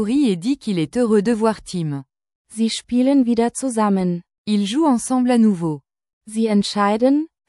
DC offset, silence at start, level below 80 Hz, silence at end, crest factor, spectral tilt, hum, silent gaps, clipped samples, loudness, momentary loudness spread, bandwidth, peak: under 0.1%; 0 s; -56 dBFS; 0.25 s; 14 dB; -6 dB/octave; none; 2.35-2.45 s, 4.38-4.45 s, 6.13-6.21 s; under 0.1%; -19 LUFS; 10 LU; 12 kHz; -4 dBFS